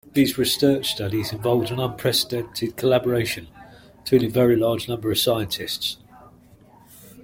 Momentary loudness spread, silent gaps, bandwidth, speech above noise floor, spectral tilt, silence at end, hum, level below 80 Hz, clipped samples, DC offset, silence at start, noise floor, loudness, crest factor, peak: 8 LU; none; 16.5 kHz; 29 dB; -5 dB/octave; 0 s; none; -54 dBFS; under 0.1%; under 0.1%; 0.15 s; -51 dBFS; -22 LUFS; 18 dB; -4 dBFS